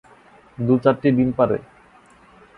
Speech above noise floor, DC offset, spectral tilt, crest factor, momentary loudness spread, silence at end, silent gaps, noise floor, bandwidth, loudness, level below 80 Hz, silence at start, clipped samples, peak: 33 dB; under 0.1%; -10 dB/octave; 20 dB; 9 LU; 0.95 s; none; -51 dBFS; 4.9 kHz; -19 LUFS; -52 dBFS; 0.6 s; under 0.1%; -2 dBFS